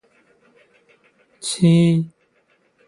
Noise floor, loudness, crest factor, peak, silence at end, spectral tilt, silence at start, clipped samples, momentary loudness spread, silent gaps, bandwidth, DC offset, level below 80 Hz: -62 dBFS; -18 LUFS; 18 dB; -4 dBFS; 0.8 s; -6.5 dB/octave; 1.45 s; under 0.1%; 16 LU; none; 11.5 kHz; under 0.1%; -62 dBFS